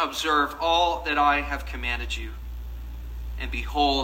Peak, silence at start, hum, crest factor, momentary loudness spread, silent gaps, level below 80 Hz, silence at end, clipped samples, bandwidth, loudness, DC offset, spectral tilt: -8 dBFS; 0 s; none; 18 dB; 16 LU; none; -34 dBFS; 0 s; under 0.1%; 16 kHz; -25 LUFS; under 0.1%; -4 dB/octave